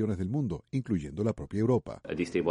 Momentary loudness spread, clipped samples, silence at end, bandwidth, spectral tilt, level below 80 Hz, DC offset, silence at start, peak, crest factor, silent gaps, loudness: 6 LU; under 0.1%; 0 s; 11 kHz; -8 dB/octave; -52 dBFS; under 0.1%; 0 s; -14 dBFS; 16 dB; none; -32 LUFS